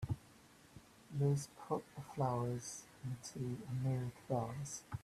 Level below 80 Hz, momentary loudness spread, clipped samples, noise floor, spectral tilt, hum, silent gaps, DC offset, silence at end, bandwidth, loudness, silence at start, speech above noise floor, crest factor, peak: -66 dBFS; 12 LU; under 0.1%; -64 dBFS; -6.5 dB/octave; none; none; under 0.1%; 0 s; 14 kHz; -42 LUFS; 0 s; 23 dB; 18 dB; -24 dBFS